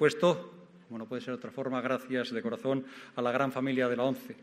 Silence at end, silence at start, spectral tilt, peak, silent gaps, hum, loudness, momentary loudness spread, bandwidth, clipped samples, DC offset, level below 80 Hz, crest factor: 0.1 s; 0 s; -6 dB/octave; -12 dBFS; none; none; -32 LUFS; 11 LU; 15 kHz; under 0.1%; under 0.1%; -80 dBFS; 20 dB